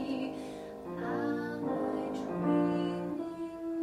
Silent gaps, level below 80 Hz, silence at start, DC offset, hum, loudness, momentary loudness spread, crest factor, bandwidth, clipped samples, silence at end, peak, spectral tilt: none; -66 dBFS; 0 s; under 0.1%; none; -35 LUFS; 11 LU; 16 dB; 12.5 kHz; under 0.1%; 0 s; -18 dBFS; -7.5 dB/octave